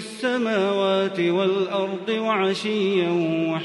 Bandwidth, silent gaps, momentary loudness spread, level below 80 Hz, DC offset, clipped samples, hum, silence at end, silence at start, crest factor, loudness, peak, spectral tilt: 11.5 kHz; none; 4 LU; -72 dBFS; under 0.1%; under 0.1%; none; 0 s; 0 s; 12 dB; -22 LUFS; -10 dBFS; -6 dB/octave